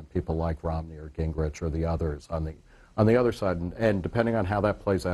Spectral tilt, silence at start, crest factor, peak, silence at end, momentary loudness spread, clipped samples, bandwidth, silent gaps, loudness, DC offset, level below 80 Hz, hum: -8 dB/octave; 0 s; 20 dB; -8 dBFS; 0 s; 11 LU; under 0.1%; 12.5 kHz; none; -28 LUFS; under 0.1%; -40 dBFS; none